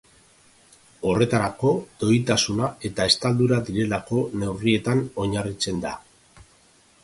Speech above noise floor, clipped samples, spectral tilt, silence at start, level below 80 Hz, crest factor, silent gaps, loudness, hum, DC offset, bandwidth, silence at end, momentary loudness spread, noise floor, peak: 34 dB; under 0.1%; -5 dB/octave; 1 s; -50 dBFS; 22 dB; none; -23 LUFS; none; under 0.1%; 11.5 kHz; 0.6 s; 7 LU; -57 dBFS; -2 dBFS